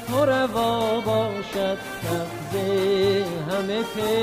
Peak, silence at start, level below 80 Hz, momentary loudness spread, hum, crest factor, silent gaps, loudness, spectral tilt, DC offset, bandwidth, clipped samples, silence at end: -10 dBFS; 0 s; -54 dBFS; 7 LU; none; 14 dB; none; -24 LUFS; -5 dB/octave; under 0.1%; 16 kHz; under 0.1%; 0 s